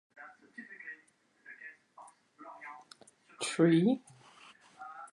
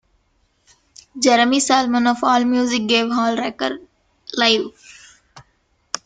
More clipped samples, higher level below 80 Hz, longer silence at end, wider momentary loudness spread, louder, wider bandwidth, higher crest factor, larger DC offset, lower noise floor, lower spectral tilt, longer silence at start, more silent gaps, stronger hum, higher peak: neither; second, -86 dBFS vs -60 dBFS; about the same, 0.05 s vs 0.1 s; first, 28 LU vs 15 LU; second, -30 LUFS vs -17 LUFS; first, 11.5 kHz vs 9.4 kHz; about the same, 22 dB vs 18 dB; neither; first, -68 dBFS vs -63 dBFS; first, -6 dB/octave vs -2 dB/octave; second, 0.2 s vs 1.15 s; neither; neither; second, -14 dBFS vs -2 dBFS